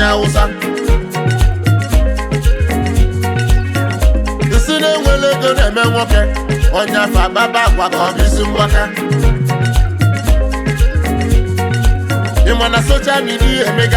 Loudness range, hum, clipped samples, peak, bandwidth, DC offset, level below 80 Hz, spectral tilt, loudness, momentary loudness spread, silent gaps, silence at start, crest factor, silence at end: 2 LU; none; under 0.1%; -2 dBFS; 16 kHz; under 0.1%; -14 dBFS; -5.5 dB/octave; -14 LUFS; 4 LU; none; 0 s; 10 dB; 0 s